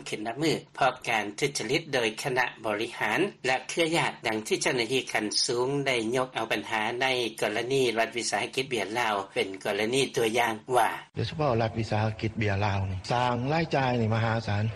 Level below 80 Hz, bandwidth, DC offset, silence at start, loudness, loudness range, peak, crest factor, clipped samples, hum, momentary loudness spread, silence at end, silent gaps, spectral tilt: -58 dBFS; 12.5 kHz; under 0.1%; 0 s; -28 LUFS; 1 LU; -12 dBFS; 16 dB; under 0.1%; none; 4 LU; 0 s; none; -4.5 dB/octave